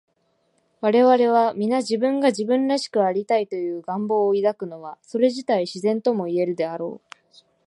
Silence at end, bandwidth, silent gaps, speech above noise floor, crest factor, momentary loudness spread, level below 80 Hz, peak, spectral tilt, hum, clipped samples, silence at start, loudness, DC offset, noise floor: 0.7 s; 11 kHz; none; 47 dB; 16 dB; 12 LU; -78 dBFS; -6 dBFS; -5.5 dB/octave; none; under 0.1%; 0.8 s; -21 LUFS; under 0.1%; -68 dBFS